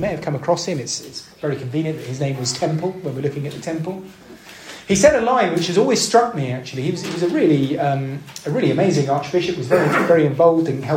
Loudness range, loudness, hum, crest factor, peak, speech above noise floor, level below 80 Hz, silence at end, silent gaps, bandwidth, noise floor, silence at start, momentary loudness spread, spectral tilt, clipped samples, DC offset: 7 LU; -19 LUFS; none; 18 dB; 0 dBFS; 20 dB; -52 dBFS; 0 s; none; 16.5 kHz; -38 dBFS; 0 s; 12 LU; -5 dB/octave; under 0.1%; under 0.1%